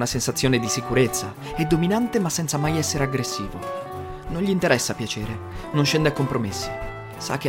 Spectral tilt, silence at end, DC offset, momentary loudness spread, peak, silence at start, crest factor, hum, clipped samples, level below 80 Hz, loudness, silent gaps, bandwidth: -4.5 dB/octave; 0 s; under 0.1%; 11 LU; -4 dBFS; 0 s; 18 dB; none; under 0.1%; -42 dBFS; -23 LUFS; none; 16.5 kHz